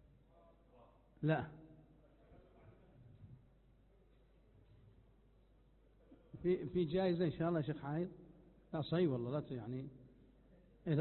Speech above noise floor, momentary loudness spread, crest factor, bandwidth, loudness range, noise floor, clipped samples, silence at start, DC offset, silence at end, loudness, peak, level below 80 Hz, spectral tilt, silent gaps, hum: 30 dB; 24 LU; 18 dB; 4.2 kHz; 8 LU; -69 dBFS; under 0.1%; 1.2 s; under 0.1%; 0 s; -40 LUFS; -24 dBFS; -68 dBFS; -7 dB/octave; none; none